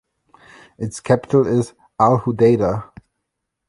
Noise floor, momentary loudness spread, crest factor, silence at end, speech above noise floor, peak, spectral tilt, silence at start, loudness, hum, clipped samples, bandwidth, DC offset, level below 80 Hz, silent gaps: -78 dBFS; 14 LU; 18 dB; 0.85 s; 61 dB; -2 dBFS; -7.5 dB/octave; 0.8 s; -18 LUFS; none; under 0.1%; 11.5 kHz; under 0.1%; -50 dBFS; none